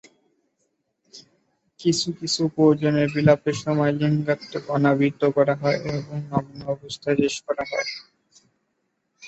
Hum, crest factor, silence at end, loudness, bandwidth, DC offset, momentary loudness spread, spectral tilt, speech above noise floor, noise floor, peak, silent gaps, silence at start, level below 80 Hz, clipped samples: none; 20 dB; 0 s; -23 LUFS; 8.4 kHz; under 0.1%; 10 LU; -6 dB/octave; 52 dB; -74 dBFS; -2 dBFS; none; 1.15 s; -60 dBFS; under 0.1%